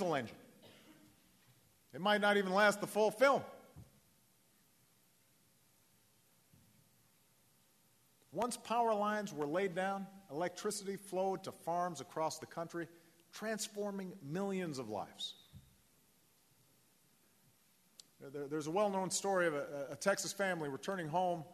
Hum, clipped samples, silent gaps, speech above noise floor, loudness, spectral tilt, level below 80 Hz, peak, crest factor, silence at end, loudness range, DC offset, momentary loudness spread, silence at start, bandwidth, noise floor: none; under 0.1%; none; 35 dB; -37 LUFS; -4 dB/octave; -82 dBFS; -16 dBFS; 24 dB; 0 s; 12 LU; under 0.1%; 15 LU; 0 s; 13.5 kHz; -72 dBFS